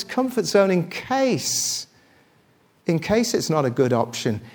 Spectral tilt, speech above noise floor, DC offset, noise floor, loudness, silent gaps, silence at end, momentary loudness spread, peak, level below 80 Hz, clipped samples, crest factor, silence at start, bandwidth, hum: -4.5 dB/octave; 38 dB; under 0.1%; -59 dBFS; -22 LUFS; none; 0.05 s; 7 LU; -4 dBFS; -56 dBFS; under 0.1%; 18 dB; 0 s; 20 kHz; none